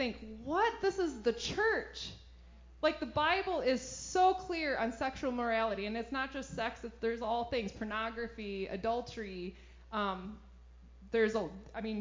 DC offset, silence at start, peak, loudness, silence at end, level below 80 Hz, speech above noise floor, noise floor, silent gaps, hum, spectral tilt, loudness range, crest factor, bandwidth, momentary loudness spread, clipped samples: under 0.1%; 0 s; -18 dBFS; -35 LUFS; 0 s; -56 dBFS; 21 dB; -56 dBFS; none; none; -4 dB/octave; 5 LU; 18 dB; 7.6 kHz; 12 LU; under 0.1%